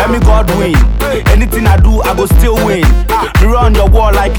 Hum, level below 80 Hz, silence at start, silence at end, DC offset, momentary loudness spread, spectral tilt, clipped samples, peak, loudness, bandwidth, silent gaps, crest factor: none; -10 dBFS; 0 s; 0 s; under 0.1%; 3 LU; -6 dB/octave; 0.7%; 0 dBFS; -10 LUFS; 19 kHz; none; 8 dB